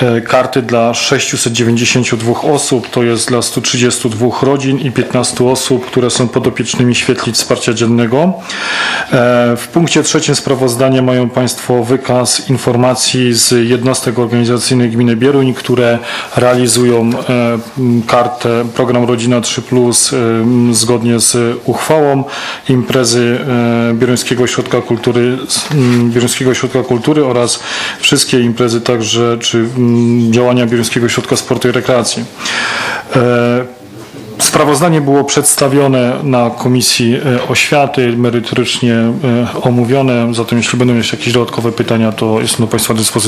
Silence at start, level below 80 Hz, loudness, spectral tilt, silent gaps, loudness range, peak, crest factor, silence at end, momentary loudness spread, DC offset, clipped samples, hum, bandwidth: 0 s; -48 dBFS; -11 LUFS; -4.5 dB/octave; none; 2 LU; 0 dBFS; 10 dB; 0 s; 4 LU; under 0.1%; 0.2%; none; 15 kHz